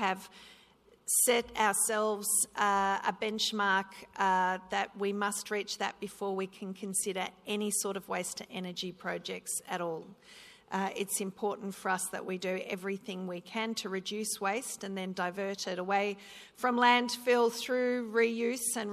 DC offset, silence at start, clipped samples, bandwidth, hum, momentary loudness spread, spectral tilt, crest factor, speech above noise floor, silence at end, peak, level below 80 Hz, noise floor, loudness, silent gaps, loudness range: under 0.1%; 0 s; under 0.1%; 14 kHz; none; 11 LU; -2.5 dB/octave; 20 dB; 30 dB; 0 s; -12 dBFS; -72 dBFS; -63 dBFS; -32 LUFS; none; 7 LU